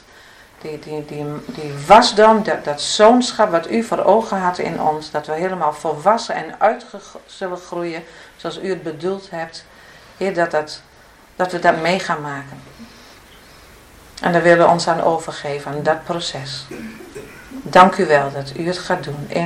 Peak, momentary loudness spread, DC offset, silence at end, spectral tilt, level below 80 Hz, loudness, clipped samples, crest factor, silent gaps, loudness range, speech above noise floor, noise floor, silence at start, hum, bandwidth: 0 dBFS; 20 LU; under 0.1%; 0 s; -4.5 dB/octave; -52 dBFS; -17 LUFS; under 0.1%; 18 dB; none; 10 LU; 29 dB; -47 dBFS; 0.65 s; none; 15 kHz